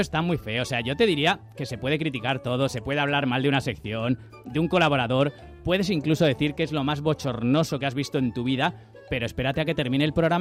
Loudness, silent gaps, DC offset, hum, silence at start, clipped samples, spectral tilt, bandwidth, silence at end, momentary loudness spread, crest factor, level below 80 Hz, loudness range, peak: -25 LUFS; none; under 0.1%; none; 0 s; under 0.1%; -6 dB/octave; 15 kHz; 0 s; 7 LU; 14 dB; -50 dBFS; 2 LU; -10 dBFS